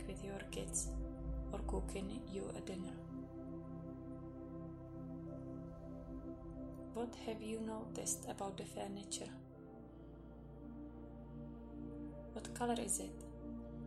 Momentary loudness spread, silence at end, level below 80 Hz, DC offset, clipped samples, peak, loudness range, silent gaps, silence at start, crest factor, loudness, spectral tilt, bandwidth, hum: 12 LU; 0 s; -54 dBFS; under 0.1%; under 0.1%; -26 dBFS; 5 LU; none; 0 s; 22 dB; -47 LUFS; -4.5 dB/octave; 15 kHz; none